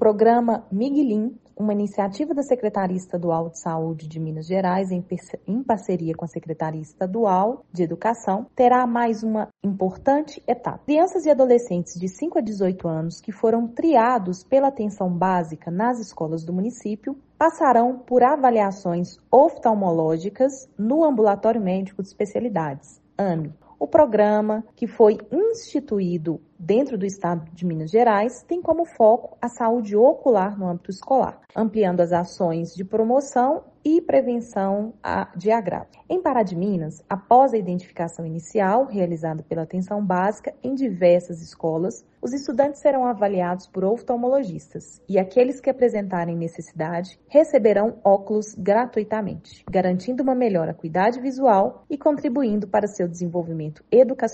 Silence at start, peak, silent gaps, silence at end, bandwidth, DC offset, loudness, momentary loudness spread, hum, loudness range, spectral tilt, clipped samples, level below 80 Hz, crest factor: 0 s; -2 dBFS; none; 0 s; 8.4 kHz; under 0.1%; -22 LUFS; 11 LU; none; 4 LU; -7.5 dB/octave; under 0.1%; -60 dBFS; 20 dB